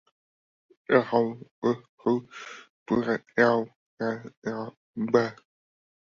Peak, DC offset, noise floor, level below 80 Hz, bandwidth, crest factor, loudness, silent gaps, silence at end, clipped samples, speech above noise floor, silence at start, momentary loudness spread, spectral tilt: -6 dBFS; under 0.1%; under -90 dBFS; -68 dBFS; 7.2 kHz; 22 dB; -27 LUFS; 1.51-1.62 s, 1.89-1.98 s, 2.70-2.86 s, 3.76-3.97 s, 4.37-4.42 s, 4.77-4.94 s; 0.7 s; under 0.1%; over 64 dB; 0.9 s; 18 LU; -7 dB/octave